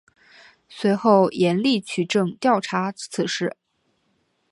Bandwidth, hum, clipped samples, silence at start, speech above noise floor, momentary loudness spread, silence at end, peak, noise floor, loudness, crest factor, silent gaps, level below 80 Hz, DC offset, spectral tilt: 11.5 kHz; none; under 0.1%; 0.7 s; 48 dB; 9 LU; 1 s; -2 dBFS; -69 dBFS; -21 LUFS; 20 dB; none; -70 dBFS; under 0.1%; -5.5 dB/octave